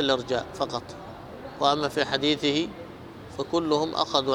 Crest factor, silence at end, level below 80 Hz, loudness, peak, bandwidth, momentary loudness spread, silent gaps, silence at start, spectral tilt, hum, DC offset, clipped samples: 22 dB; 0 s; -56 dBFS; -26 LUFS; -6 dBFS; 16 kHz; 17 LU; none; 0 s; -4.5 dB/octave; none; under 0.1%; under 0.1%